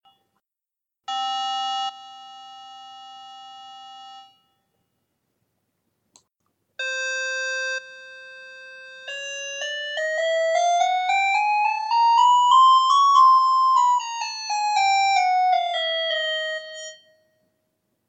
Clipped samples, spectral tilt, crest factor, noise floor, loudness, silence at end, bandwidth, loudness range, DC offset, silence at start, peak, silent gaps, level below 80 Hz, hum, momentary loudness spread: under 0.1%; 3 dB/octave; 16 dB; -87 dBFS; -20 LUFS; 1.15 s; 8.6 kHz; 14 LU; under 0.1%; 1.1 s; -6 dBFS; none; under -90 dBFS; none; 26 LU